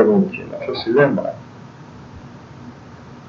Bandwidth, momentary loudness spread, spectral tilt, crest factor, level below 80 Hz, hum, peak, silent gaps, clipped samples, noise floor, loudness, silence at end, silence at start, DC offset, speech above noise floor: 7 kHz; 24 LU; -8 dB/octave; 20 dB; -54 dBFS; none; -2 dBFS; none; under 0.1%; -39 dBFS; -19 LUFS; 0.05 s; 0 s; under 0.1%; 21 dB